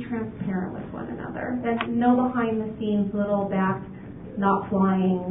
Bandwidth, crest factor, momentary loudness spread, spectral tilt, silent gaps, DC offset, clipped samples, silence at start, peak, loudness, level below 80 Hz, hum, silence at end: 3.9 kHz; 16 dB; 12 LU; -12 dB/octave; none; under 0.1%; under 0.1%; 0 s; -8 dBFS; -25 LUFS; -52 dBFS; none; 0 s